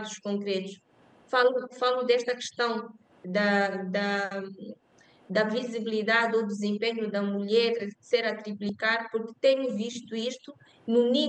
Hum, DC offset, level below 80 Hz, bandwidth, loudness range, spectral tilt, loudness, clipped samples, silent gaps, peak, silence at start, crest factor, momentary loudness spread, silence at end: none; under 0.1%; -82 dBFS; 9 kHz; 2 LU; -4.5 dB/octave; -28 LUFS; under 0.1%; none; -10 dBFS; 0 s; 18 dB; 11 LU; 0 s